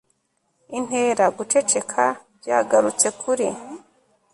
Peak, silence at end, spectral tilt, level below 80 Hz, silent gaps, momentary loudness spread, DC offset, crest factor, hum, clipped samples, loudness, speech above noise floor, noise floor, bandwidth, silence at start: -4 dBFS; 0.55 s; -2.5 dB/octave; -68 dBFS; none; 15 LU; under 0.1%; 18 dB; none; under 0.1%; -21 LUFS; 50 dB; -70 dBFS; 11.5 kHz; 0.7 s